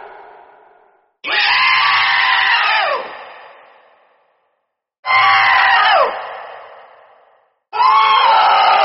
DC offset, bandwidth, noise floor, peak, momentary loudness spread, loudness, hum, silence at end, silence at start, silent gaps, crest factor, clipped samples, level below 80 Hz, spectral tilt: under 0.1%; 6 kHz; -71 dBFS; -2 dBFS; 18 LU; -12 LUFS; none; 0 s; 0 s; 4.99-5.03 s; 14 dB; under 0.1%; -62 dBFS; 4 dB/octave